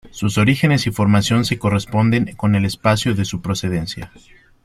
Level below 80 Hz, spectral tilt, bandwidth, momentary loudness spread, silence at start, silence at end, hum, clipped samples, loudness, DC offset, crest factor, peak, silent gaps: -44 dBFS; -5.5 dB/octave; 14.5 kHz; 8 LU; 0.05 s; 0.6 s; none; under 0.1%; -18 LUFS; under 0.1%; 16 dB; -2 dBFS; none